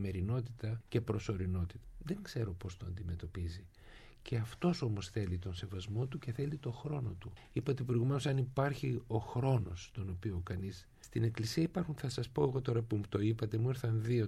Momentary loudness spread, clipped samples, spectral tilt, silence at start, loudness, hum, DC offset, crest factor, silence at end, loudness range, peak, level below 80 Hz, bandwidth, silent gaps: 10 LU; under 0.1%; -7 dB/octave; 0 s; -38 LUFS; none; under 0.1%; 18 dB; 0 s; 4 LU; -18 dBFS; -56 dBFS; 13.5 kHz; none